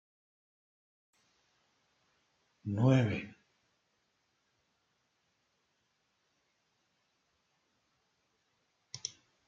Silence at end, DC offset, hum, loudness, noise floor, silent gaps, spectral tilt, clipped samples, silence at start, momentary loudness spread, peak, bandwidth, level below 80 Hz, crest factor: 0.4 s; under 0.1%; none; -32 LUFS; -79 dBFS; none; -6.5 dB/octave; under 0.1%; 2.65 s; 21 LU; -16 dBFS; 7.8 kHz; -76 dBFS; 26 dB